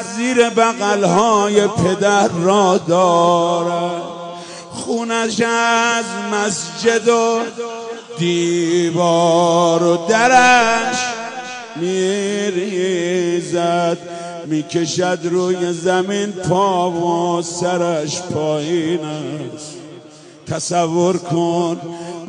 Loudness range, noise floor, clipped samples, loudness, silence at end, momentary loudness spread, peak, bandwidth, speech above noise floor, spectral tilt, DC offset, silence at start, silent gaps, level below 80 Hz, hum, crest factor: 6 LU; -40 dBFS; under 0.1%; -16 LUFS; 0 s; 13 LU; -2 dBFS; 10.5 kHz; 24 dB; -4.5 dB/octave; under 0.1%; 0 s; none; -58 dBFS; none; 14 dB